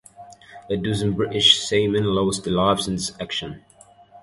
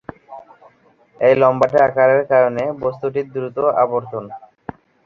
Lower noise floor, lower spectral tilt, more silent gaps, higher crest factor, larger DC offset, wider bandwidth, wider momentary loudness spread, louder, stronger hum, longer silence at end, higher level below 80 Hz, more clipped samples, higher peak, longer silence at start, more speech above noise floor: second, -49 dBFS vs -53 dBFS; second, -4 dB/octave vs -8 dB/octave; neither; first, 22 dB vs 16 dB; neither; first, 11.5 kHz vs 7 kHz; second, 13 LU vs 22 LU; second, -20 LUFS vs -16 LUFS; neither; second, 0.05 s vs 0.7 s; first, -48 dBFS vs -56 dBFS; neither; about the same, -2 dBFS vs -2 dBFS; about the same, 0.2 s vs 0.3 s; second, 28 dB vs 37 dB